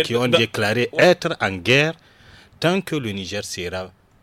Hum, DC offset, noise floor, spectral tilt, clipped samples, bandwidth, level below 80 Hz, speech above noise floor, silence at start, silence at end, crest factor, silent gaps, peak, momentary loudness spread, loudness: none; under 0.1%; -48 dBFS; -4.5 dB/octave; under 0.1%; 16.5 kHz; -56 dBFS; 29 dB; 0 s; 0.35 s; 18 dB; none; -4 dBFS; 12 LU; -20 LUFS